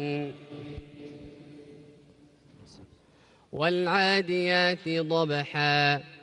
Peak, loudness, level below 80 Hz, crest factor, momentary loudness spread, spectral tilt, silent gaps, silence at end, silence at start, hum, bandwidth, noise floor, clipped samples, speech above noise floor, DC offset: -12 dBFS; -26 LUFS; -62 dBFS; 18 dB; 22 LU; -5.5 dB/octave; none; 0.05 s; 0 s; none; 11 kHz; -60 dBFS; under 0.1%; 33 dB; under 0.1%